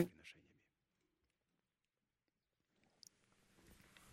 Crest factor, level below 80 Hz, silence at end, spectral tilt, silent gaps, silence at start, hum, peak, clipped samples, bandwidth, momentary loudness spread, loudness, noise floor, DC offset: 32 dB; -82 dBFS; 3.8 s; -6 dB/octave; none; 0 s; none; -22 dBFS; under 0.1%; 14.5 kHz; 14 LU; -49 LUFS; under -90 dBFS; under 0.1%